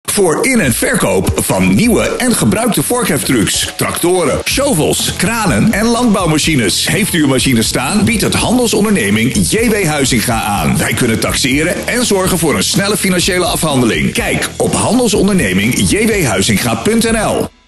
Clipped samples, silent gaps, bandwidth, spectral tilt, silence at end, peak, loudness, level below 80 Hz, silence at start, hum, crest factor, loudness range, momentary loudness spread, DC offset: under 0.1%; none; 13 kHz; -4 dB/octave; 0.2 s; -2 dBFS; -12 LUFS; -30 dBFS; 0.05 s; none; 10 dB; 1 LU; 2 LU; under 0.1%